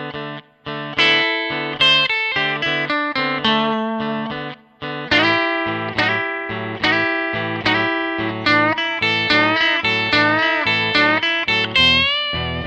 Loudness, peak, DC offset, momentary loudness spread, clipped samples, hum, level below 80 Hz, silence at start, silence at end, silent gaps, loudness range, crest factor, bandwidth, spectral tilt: -16 LUFS; -2 dBFS; under 0.1%; 12 LU; under 0.1%; none; -48 dBFS; 0 s; 0 s; none; 4 LU; 16 dB; 9 kHz; -4.5 dB/octave